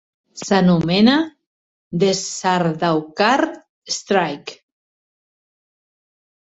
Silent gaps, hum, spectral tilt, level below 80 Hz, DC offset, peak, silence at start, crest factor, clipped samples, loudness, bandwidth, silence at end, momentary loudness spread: 1.46-1.91 s, 3.69-3.82 s; none; -5 dB/octave; -58 dBFS; under 0.1%; -2 dBFS; 0.35 s; 18 dB; under 0.1%; -18 LUFS; 8.2 kHz; 1.95 s; 14 LU